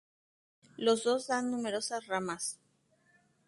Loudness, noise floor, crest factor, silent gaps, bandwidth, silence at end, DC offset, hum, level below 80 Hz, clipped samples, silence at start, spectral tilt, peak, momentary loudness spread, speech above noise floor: -33 LUFS; -71 dBFS; 20 dB; none; 11.5 kHz; 0.9 s; under 0.1%; none; -78 dBFS; under 0.1%; 0.8 s; -3 dB/octave; -16 dBFS; 8 LU; 39 dB